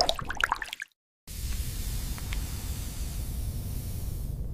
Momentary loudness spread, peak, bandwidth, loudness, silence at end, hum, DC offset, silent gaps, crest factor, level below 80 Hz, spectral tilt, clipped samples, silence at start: 10 LU; -6 dBFS; 16 kHz; -34 LUFS; 0 s; none; 0.1%; 0.96-1.27 s; 26 dB; -36 dBFS; -3.5 dB/octave; under 0.1%; 0 s